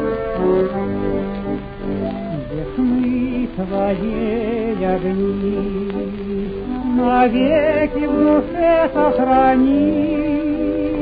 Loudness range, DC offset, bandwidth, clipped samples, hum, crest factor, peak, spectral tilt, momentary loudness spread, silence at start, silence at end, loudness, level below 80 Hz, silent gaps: 6 LU; under 0.1%; 5 kHz; under 0.1%; none; 14 dB; -2 dBFS; -10.5 dB/octave; 10 LU; 0 s; 0 s; -18 LUFS; -36 dBFS; none